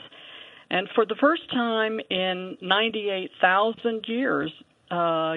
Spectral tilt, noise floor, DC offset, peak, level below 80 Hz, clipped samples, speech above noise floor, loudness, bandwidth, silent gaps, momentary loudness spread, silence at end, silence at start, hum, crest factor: -7 dB/octave; -46 dBFS; under 0.1%; -4 dBFS; -74 dBFS; under 0.1%; 21 dB; -25 LUFS; 4.5 kHz; none; 11 LU; 0 s; 0 s; none; 20 dB